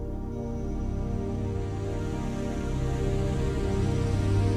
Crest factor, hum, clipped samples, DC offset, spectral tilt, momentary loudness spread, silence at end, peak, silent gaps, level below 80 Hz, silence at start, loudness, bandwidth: 14 dB; none; under 0.1%; under 0.1%; -7.5 dB/octave; 6 LU; 0 s; -14 dBFS; none; -34 dBFS; 0 s; -30 LUFS; 11 kHz